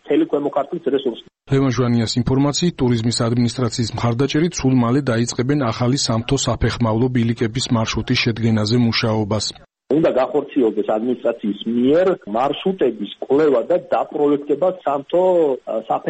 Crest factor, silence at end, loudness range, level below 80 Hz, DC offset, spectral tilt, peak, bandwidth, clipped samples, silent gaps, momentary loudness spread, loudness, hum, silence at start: 12 dB; 0 s; 1 LU; -42 dBFS; under 0.1%; -5.5 dB/octave; -6 dBFS; 8.8 kHz; under 0.1%; none; 5 LU; -19 LUFS; none; 0.05 s